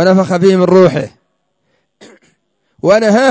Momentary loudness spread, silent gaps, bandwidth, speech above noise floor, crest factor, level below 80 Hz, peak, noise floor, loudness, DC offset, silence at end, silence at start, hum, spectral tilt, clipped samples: 11 LU; none; 8 kHz; 56 dB; 12 dB; -52 dBFS; 0 dBFS; -64 dBFS; -10 LUFS; under 0.1%; 0 s; 0 s; none; -6.5 dB/octave; under 0.1%